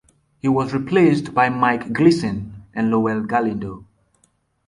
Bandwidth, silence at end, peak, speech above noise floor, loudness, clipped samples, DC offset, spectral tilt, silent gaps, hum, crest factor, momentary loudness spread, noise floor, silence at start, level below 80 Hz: 11 kHz; 0.85 s; -2 dBFS; 45 dB; -19 LUFS; under 0.1%; under 0.1%; -7 dB/octave; none; none; 18 dB; 14 LU; -63 dBFS; 0.45 s; -52 dBFS